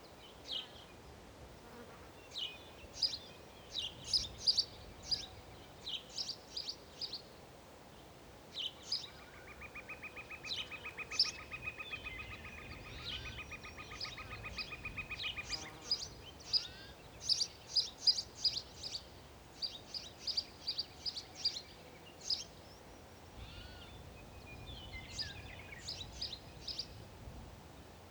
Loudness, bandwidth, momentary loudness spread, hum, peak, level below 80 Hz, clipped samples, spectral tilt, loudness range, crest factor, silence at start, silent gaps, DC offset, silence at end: -39 LUFS; over 20 kHz; 21 LU; none; -18 dBFS; -60 dBFS; under 0.1%; -1.5 dB/octave; 10 LU; 26 dB; 0 s; none; under 0.1%; 0 s